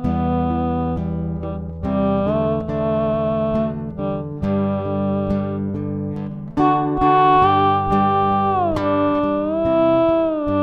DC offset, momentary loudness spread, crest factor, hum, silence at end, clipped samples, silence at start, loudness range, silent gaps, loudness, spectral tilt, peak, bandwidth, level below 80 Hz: under 0.1%; 10 LU; 16 dB; none; 0 s; under 0.1%; 0 s; 5 LU; none; -19 LUFS; -9.5 dB/octave; -4 dBFS; 6.2 kHz; -38 dBFS